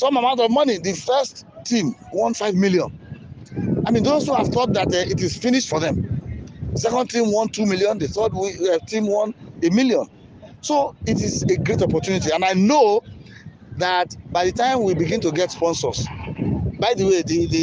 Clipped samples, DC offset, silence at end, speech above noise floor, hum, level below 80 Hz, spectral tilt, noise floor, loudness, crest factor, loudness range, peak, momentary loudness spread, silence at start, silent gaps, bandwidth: under 0.1%; under 0.1%; 0 s; 22 dB; none; -44 dBFS; -5 dB/octave; -41 dBFS; -20 LUFS; 16 dB; 2 LU; -6 dBFS; 10 LU; 0 s; none; 10 kHz